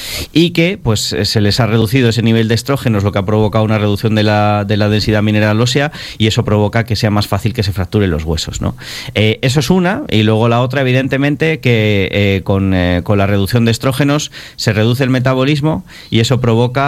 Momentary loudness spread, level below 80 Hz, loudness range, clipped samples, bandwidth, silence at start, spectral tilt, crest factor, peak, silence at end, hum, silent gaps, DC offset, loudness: 5 LU; -34 dBFS; 2 LU; 0.1%; 15.5 kHz; 0 s; -6 dB/octave; 12 dB; 0 dBFS; 0 s; none; none; under 0.1%; -13 LUFS